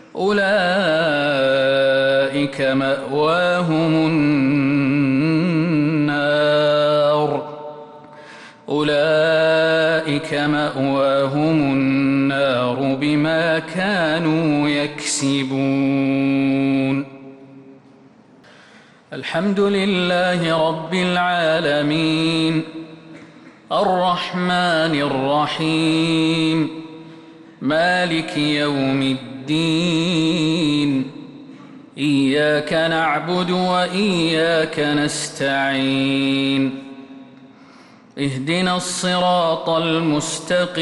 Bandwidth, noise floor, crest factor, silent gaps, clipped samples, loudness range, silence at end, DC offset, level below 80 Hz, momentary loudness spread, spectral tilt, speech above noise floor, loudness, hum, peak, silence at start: 11.5 kHz; -48 dBFS; 10 dB; none; under 0.1%; 4 LU; 0 s; under 0.1%; -56 dBFS; 7 LU; -5 dB/octave; 30 dB; -18 LUFS; none; -8 dBFS; 0.15 s